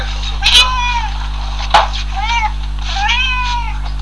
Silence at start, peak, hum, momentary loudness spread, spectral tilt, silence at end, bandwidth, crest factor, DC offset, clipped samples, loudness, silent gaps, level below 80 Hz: 0 s; 0 dBFS; 50 Hz at -20 dBFS; 14 LU; -2 dB/octave; 0 s; 11 kHz; 16 dB; 4%; 0.2%; -14 LUFS; none; -20 dBFS